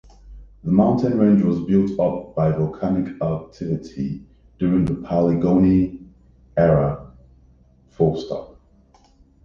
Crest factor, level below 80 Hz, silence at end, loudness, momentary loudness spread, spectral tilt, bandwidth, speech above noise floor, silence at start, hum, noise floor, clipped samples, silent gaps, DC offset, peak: 18 dB; -42 dBFS; 0.95 s; -20 LUFS; 12 LU; -10 dB/octave; 6.8 kHz; 35 dB; 0.25 s; none; -54 dBFS; under 0.1%; none; under 0.1%; -4 dBFS